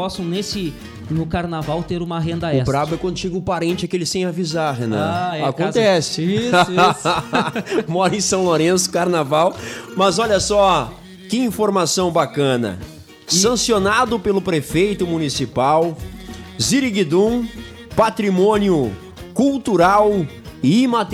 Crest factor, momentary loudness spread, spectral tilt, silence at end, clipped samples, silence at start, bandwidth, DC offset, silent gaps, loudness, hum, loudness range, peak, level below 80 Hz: 14 dB; 10 LU; -4.5 dB/octave; 0 s; under 0.1%; 0 s; 16 kHz; under 0.1%; none; -18 LUFS; none; 4 LU; -4 dBFS; -42 dBFS